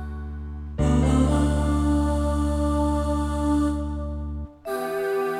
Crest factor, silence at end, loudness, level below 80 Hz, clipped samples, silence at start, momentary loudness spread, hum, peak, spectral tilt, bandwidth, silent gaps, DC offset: 14 dB; 0 s; -24 LUFS; -28 dBFS; under 0.1%; 0 s; 14 LU; none; -10 dBFS; -7.5 dB/octave; 13 kHz; none; under 0.1%